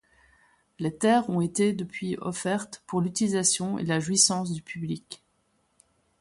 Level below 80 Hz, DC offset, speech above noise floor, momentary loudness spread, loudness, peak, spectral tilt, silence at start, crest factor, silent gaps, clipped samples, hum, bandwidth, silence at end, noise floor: -66 dBFS; under 0.1%; 44 dB; 13 LU; -26 LUFS; -8 dBFS; -4 dB/octave; 0.8 s; 20 dB; none; under 0.1%; none; 11.5 kHz; 1.05 s; -71 dBFS